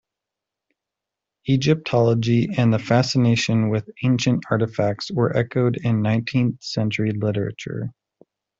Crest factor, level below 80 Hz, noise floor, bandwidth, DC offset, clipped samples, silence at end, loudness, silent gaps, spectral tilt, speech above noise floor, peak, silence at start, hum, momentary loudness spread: 18 dB; -56 dBFS; -86 dBFS; 7.8 kHz; under 0.1%; under 0.1%; 0.7 s; -21 LUFS; none; -6.5 dB/octave; 65 dB; -4 dBFS; 1.45 s; none; 7 LU